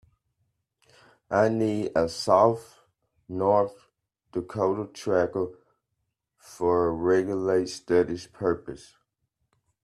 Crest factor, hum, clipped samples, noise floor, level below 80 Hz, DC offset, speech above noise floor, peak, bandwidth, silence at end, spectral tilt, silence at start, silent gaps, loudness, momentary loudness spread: 20 dB; none; under 0.1%; -80 dBFS; -60 dBFS; under 0.1%; 55 dB; -6 dBFS; 13 kHz; 1.05 s; -6 dB/octave; 1.3 s; none; -26 LUFS; 12 LU